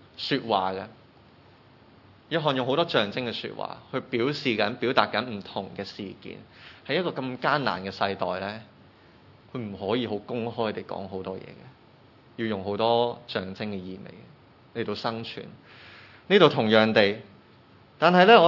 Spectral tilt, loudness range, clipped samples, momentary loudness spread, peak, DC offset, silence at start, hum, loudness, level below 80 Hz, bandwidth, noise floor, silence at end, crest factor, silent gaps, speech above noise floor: -6.5 dB/octave; 8 LU; under 0.1%; 21 LU; -2 dBFS; under 0.1%; 0.2 s; none; -26 LUFS; -72 dBFS; 6 kHz; -55 dBFS; 0 s; 26 dB; none; 29 dB